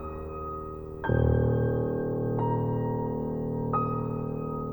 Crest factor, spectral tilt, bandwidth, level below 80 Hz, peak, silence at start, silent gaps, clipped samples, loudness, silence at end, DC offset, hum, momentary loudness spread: 16 dB; -11.5 dB/octave; over 20 kHz; -40 dBFS; -12 dBFS; 0 s; none; under 0.1%; -29 LUFS; 0 s; under 0.1%; none; 11 LU